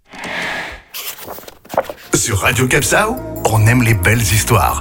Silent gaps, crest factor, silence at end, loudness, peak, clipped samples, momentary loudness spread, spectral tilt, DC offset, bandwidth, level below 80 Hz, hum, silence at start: none; 16 dB; 0 s; -15 LUFS; 0 dBFS; under 0.1%; 14 LU; -4 dB/octave; under 0.1%; 17 kHz; -32 dBFS; none; 0.15 s